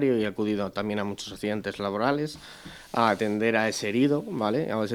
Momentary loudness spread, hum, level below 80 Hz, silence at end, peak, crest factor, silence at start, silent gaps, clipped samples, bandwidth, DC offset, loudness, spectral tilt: 9 LU; none; -60 dBFS; 0 s; -6 dBFS; 20 dB; 0 s; none; under 0.1%; 17.5 kHz; under 0.1%; -27 LUFS; -5.5 dB/octave